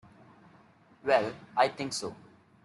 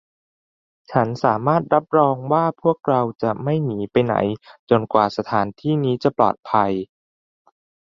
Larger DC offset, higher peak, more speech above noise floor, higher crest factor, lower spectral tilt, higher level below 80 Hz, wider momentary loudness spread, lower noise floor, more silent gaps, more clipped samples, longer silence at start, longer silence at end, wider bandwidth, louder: neither; second, -10 dBFS vs -2 dBFS; second, 31 dB vs over 71 dB; about the same, 22 dB vs 18 dB; second, -3.5 dB/octave vs -8.5 dB/octave; second, -72 dBFS vs -58 dBFS; first, 10 LU vs 5 LU; second, -60 dBFS vs under -90 dBFS; second, none vs 4.59-4.67 s; neither; first, 1.05 s vs 0.9 s; second, 0.5 s vs 1 s; first, 12 kHz vs 7.4 kHz; second, -30 LUFS vs -20 LUFS